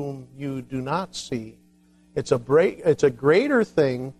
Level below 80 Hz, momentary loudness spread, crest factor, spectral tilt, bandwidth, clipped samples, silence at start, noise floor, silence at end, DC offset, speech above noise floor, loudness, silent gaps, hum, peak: -58 dBFS; 14 LU; 18 dB; -6 dB/octave; 11.5 kHz; under 0.1%; 0 s; -57 dBFS; 0.05 s; under 0.1%; 34 dB; -23 LUFS; none; none; -6 dBFS